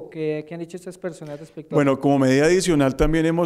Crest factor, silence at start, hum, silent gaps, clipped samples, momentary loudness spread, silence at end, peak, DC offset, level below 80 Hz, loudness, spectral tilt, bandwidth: 14 dB; 0 s; none; none; under 0.1%; 18 LU; 0 s; -6 dBFS; under 0.1%; -36 dBFS; -20 LUFS; -6 dB/octave; 14 kHz